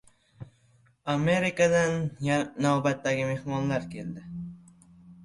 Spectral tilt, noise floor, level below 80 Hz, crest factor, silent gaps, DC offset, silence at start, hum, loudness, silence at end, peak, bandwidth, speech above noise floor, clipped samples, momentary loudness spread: -6 dB/octave; -63 dBFS; -60 dBFS; 18 dB; none; under 0.1%; 0.4 s; none; -27 LUFS; 0 s; -10 dBFS; 11.5 kHz; 36 dB; under 0.1%; 16 LU